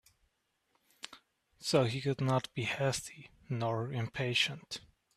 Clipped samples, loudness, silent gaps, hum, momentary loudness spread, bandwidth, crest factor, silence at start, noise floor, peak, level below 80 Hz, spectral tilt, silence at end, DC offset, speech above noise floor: under 0.1%; -34 LUFS; none; none; 19 LU; 14.5 kHz; 22 dB; 1.05 s; -79 dBFS; -14 dBFS; -68 dBFS; -4.5 dB/octave; 0.35 s; under 0.1%; 45 dB